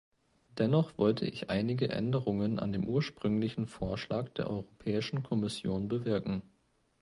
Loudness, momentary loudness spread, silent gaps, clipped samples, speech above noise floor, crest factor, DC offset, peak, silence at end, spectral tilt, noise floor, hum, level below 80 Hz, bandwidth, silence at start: -33 LUFS; 7 LU; none; under 0.1%; 40 dB; 18 dB; under 0.1%; -14 dBFS; 0.6 s; -7.5 dB/octave; -72 dBFS; none; -58 dBFS; 11.5 kHz; 0.55 s